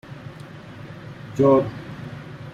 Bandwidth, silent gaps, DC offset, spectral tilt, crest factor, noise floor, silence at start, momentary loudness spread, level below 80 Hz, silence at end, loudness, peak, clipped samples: 9.4 kHz; none; under 0.1%; -8.5 dB/octave; 20 dB; -40 dBFS; 0.1 s; 22 LU; -54 dBFS; 0.05 s; -20 LUFS; -6 dBFS; under 0.1%